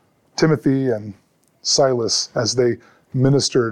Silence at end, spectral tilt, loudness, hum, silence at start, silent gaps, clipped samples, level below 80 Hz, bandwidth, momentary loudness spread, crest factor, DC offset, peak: 0 s; -4.5 dB/octave; -18 LUFS; none; 0.35 s; none; under 0.1%; -54 dBFS; 11.5 kHz; 12 LU; 16 dB; under 0.1%; -4 dBFS